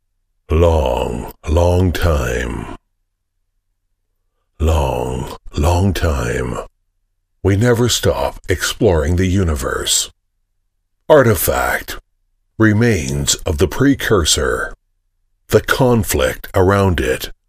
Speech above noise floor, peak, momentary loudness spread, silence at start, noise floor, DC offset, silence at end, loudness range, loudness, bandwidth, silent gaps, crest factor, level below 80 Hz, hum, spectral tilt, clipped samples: 54 dB; 0 dBFS; 10 LU; 0.5 s; -69 dBFS; under 0.1%; 0.15 s; 5 LU; -16 LUFS; 15.5 kHz; none; 16 dB; -26 dBFS; none; -5 dB/octave; under 0.1%